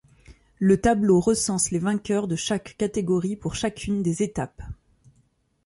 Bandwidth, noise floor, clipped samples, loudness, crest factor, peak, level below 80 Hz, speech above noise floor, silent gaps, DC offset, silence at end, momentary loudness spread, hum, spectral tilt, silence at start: 11.5 kHz; -65 dBFS; under 0.1%; -24 LUFS; 16 dB; -8 dBFS; -48 dBFS; 42 dB; none; under 0.1%; 0.9 s; 11 LU; none; -5 dB/octave; 0.3 s